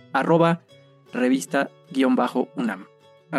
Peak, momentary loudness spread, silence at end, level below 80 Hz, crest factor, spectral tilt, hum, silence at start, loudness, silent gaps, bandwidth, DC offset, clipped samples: -6 dBFS; 10 LU; 0 s; -82 dBFS; 18 dB; -6 dB/octave; none; 0.15 s; -23 LUFS; none; 12.5 kHz; under 0.1%; under 0.1%